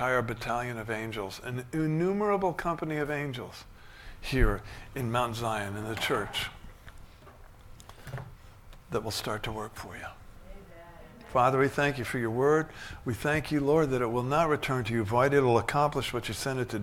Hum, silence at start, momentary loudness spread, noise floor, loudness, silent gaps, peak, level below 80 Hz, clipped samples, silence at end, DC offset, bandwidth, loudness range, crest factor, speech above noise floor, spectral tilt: none; 0 s; 17 LU; -51 dBFS; -29 LUFS; none; -10 dBFS; -44 dBFS; under 0.1%; 0 s; under 0.1%; 17.5 kHz; 11 LU; 20 dB; 22 dB; -5.5 dB/octave